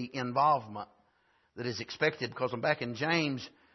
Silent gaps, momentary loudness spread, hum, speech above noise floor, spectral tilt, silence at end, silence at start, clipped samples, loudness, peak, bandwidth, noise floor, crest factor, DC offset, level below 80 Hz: none; 13 LU; none; 39 dB; -3 dB/octave; 0.25 s; 0 s; under 0.1%; -31 LUFS; -12 dBFS; 6.2 kHz; -71 dBFS; 20 dB; under 0.1%; -74 dBFS